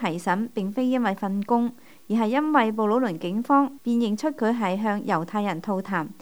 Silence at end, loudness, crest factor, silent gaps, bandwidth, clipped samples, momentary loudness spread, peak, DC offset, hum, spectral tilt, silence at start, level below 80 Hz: 0.1 s; -24 LUFS; 18 dB; none; over 20 kHz; under 0.1%; 7 LU; -6 dBFS; 0.3%; none; -6.5 dB/octave; 0 s; -72 dBFS